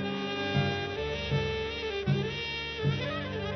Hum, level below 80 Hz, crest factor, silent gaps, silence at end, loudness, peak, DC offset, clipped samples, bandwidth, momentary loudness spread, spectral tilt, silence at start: none; -48 dBFS; 16 dB; none; 0 s; -31 LUFS; -14 dBFS; under 0.1%; under 0.1%; 6.4 kHz; 4 LU; -6 dB/octave; 0 s